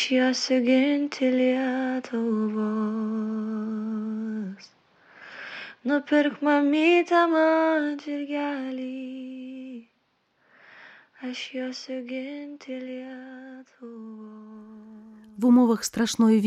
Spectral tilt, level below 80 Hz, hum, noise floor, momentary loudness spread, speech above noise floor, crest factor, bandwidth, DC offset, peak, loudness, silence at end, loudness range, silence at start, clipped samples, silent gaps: -4.5 dB/octave; -74 dBFS; none; -70 dBFS; 23 LU; 45 dB; 16 dB; 14 kHz; under 0.1%; -10 dBFS; -25 LUFS; 0 s; 14 LU; 0 s; under 0.1%; none